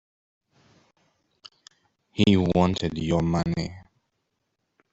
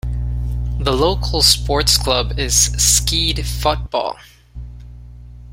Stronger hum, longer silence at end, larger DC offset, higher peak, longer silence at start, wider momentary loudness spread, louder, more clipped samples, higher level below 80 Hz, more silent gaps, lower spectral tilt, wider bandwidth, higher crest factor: second, none vs 60 Hz at -25 dBFS; first, 1.15 s vs 0 s; neither; second, -6 dBFS vs 0 dBFS; first, 2.15 s vs 0.05 s; about the same, 12 LU vs 13 LU; second, -24 LUFS vs -16 LUFS; neither; second, -50 dBFS vs -24 dBFS; neither; first, -7 dB/octave vs -2.5 dB/octave; second, 8 kHz vs 16.5 kHz; about the same, 22 dB vs 18 dB